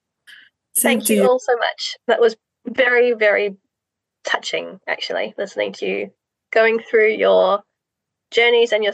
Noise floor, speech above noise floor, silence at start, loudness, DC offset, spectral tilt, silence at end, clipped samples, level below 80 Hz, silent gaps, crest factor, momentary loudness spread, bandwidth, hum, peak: -82 dBFS; 64 dB; 0.75 s; -18 LUFS; under 0.1%; -2.5 dB/octave; 0 s; under 0.1%; -78 dBFS; none; 18 dB; 11 LU; 13 kHz; none; -2 dBFS